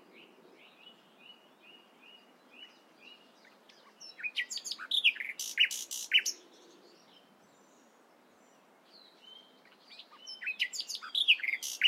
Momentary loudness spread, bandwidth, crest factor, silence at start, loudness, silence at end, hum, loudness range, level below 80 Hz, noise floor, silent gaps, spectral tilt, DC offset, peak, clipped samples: 27 LU; 16 kHz; 26 dB; 0.15 s; -30 LUFS; 0 s; none; 15 LU; under -90 dBFS; -63 dBFS; none; 3.5 dB/octave; under 0.1%; -12 dBFS; under 0.1%